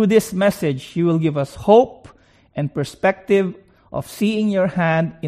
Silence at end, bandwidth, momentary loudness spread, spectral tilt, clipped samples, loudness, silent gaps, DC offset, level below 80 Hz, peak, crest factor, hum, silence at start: 0 s; 15.5 kHz; 12 LU; -6.5 dB/octave; under 0.1%; -19 LUFS; none; under 0.1%; -52 dBFS; 0 dBFS; 18 dB; none; 0 s